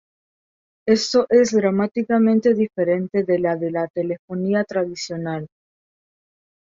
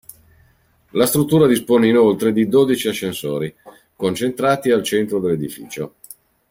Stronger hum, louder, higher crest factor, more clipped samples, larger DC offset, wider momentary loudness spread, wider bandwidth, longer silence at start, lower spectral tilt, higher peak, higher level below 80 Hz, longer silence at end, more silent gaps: neither; second, -20 LUFS vs -17 LUFS; about the same, 18 dB vs 16 dB; neither; neither; second, 11 LU vs 14 LU; second, 7.8 kHz vs 16.5 kHz; about the same, 0.85 s vs 0.95 s; about the same, -5.5 dB/octave vs -5.5 dB/octave; about the same, -4 dBFS vs -2 dBFS; second, -64 dBFS vs -56 dBFS; first, 1.2 s vs 0.6 s; first, 3.90-3.94 s, 4.19-4.28 s vs none